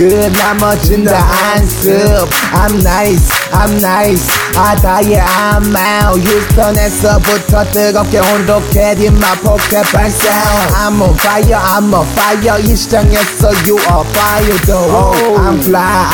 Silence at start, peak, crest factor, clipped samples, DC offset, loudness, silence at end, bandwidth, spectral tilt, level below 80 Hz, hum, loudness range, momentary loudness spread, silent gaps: 0 s; 0 dBFS; 8 dB; under 0.1%; 0.3%; -9 LUFS; 0 s; over 20 kHz; -4.5 dB/octave; -16 dBFS; none; 0 LU; 1 LU; none